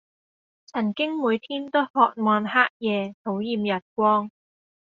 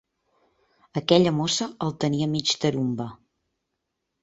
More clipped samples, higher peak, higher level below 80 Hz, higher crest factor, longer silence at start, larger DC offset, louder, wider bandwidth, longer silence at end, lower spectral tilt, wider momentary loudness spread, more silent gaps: neither; about the same, -4 dBFS vs -4 dBFS; second, -70 dBFS vs -62 dBFS; about the same, 20 dB vs 22 dB; second, 0.75 s vs 0.95 s; neither; about the same, -24 LUFS vs -24 LUFS; second, 6.6 kHz vs 8 kHz; second, 0.5 s vs 1.1 s; second, -3 dB/octave vs -5 dB/octave; second, 8 LU vs 12 LU; first, 1.90-1.94 s, 2.70-2.80 s, 3.14-3.25 s, 3.82-3.96 s vs none